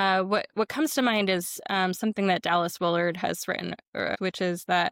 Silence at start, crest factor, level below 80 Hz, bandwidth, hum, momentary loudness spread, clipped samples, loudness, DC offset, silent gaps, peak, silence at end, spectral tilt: 0 s; 14 dB; -68 dBFS; 17 kHz; none; 7 LU; under 0.1%; -27 LUFS; under 0.1%; 3.88-3.93 s; -12 dBFS; 0 s; -4 dB/octave